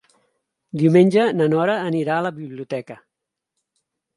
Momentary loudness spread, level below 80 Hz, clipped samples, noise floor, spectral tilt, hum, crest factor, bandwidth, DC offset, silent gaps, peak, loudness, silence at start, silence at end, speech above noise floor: 17 LU; -70 dBFS; under 0.1%; -81 dBFS; -8 dB/octave; none; 18 dB; 11.5 kHz; under 0.1%; none; -2 dBFS; -19 LUFS; 0.75 s; 1.2 s; 62 dB